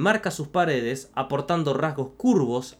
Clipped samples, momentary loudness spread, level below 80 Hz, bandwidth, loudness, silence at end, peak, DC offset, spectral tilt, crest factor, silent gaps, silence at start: under 0.1%; 6 LU; -58 dBFS; 15 kHz; -25 LUFS; 0.1 s; -8 dBFS; under 0.1%; -6 dB/octave; 16 dB; none; 0 s